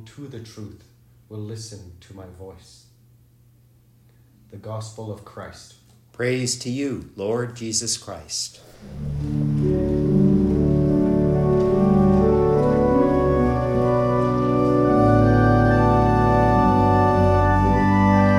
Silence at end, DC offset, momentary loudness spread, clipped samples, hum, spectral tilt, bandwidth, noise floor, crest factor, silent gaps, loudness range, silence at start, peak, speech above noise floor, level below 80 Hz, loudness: 0 s; under 0.1%; 20 LU; under 0.1%; none; -6.5 dB/octave; 13 kHz; -55 dBFS; 16 dB; none; 22 LU; 0 s; -4 dBFS; 25 dB; -34 dBFS; -19 LUFS